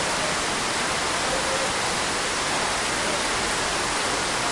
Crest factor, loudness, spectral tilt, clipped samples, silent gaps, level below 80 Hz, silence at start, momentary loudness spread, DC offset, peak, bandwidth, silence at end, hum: 14 dB; -23 LUFS; -1.5 dB/octave; under 0.1%; none; -46 dBFS; 0 s; 1 LU; under 0.1%; -10 dBFS; 11.5 kHz; 0 s; none